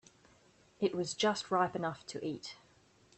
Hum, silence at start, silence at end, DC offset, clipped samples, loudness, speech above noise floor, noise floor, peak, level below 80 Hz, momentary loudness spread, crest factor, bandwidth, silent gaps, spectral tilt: none; 0.8 s; 0.65 s; under 0.1%; under 0.1%; -35 LUFS; 31 dB; -66 dBFS; -18 dBFS; -74 dBFS; 13 LU; 18 dB; 8.8 kHz; none; -4 dB/octave